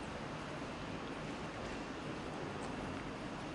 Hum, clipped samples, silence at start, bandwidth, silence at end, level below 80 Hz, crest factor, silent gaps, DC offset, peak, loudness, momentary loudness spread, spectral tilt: none; under 0.1%; 0 s; 11.5 kHz; 0 s; -58 dBFS; 14 dB; none; under 0.1%; -30 dBFS; -44 LUFS; 1 LU; -5.5 dB/octave